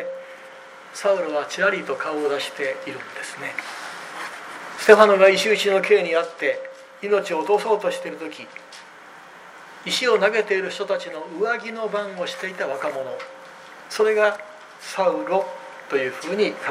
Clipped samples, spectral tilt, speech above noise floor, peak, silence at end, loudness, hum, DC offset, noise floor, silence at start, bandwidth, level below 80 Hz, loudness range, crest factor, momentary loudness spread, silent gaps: under 0.1%; -3 dB/octave; 23 dB; 0 dBFS; 0 s; -21 LUFS; none; under 0.1%; -44 dBFS; 0 s; 15 kHz; -74 dBFS; 8 LU; 22 dB; 21 LU; none